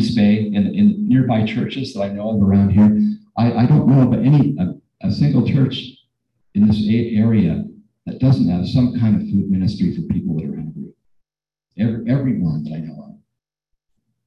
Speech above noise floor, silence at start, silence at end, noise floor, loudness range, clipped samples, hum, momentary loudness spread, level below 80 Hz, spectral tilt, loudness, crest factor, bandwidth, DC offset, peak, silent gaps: 69 dB; 0 s; 1.15 s; -85 dBFS; 8 LU; under 0.1%; none; 14 LU; -40 dBFS; -9 dB/octave; -17 LUFS; 14 dB; 6.6 kHz; under 0.1%; -2 dBFS; none